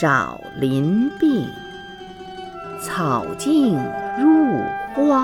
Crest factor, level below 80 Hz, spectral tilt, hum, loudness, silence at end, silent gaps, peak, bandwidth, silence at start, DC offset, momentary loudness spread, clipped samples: 16 dB; -52 dBFS; -6.5 dB/octave; none; -20 LUFS; 0 s; none; -4 dBFS; 14 kHz; 0 s; under 0.1%; 18 LU; under 0.1%